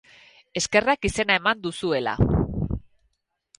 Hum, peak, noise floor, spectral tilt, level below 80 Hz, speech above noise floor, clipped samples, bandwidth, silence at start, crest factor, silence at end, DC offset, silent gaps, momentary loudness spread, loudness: none; -4 dBFS; -72 dBFS; -4.5 dB/octave; -38 dBFS; 49 dB; under 0.1%; 11.5 kHz; 0.55 s; 20 dB; 0.8 s; under 0.1%; none; 10 LU; -23 LUFS